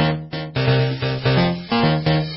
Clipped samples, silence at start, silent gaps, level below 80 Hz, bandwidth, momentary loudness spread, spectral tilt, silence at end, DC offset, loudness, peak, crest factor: under 0.1%; 0 s; none; -42 dBFS; 5.8 kHz; 5 LU; -11 dB/octave; 0 s; under 0.1%; -19 LUFS; -6 dBFS; 12 dB